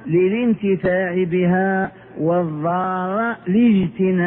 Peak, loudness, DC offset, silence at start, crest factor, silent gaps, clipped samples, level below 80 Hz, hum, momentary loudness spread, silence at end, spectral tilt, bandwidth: -6 dBFS; -19 LUFS; under 0.1%; 0 s; 12 dB; none; under 0.1%; -54 dBFS; none; 5 LU; 0 s; -12 dB/octave; 3.8 kHz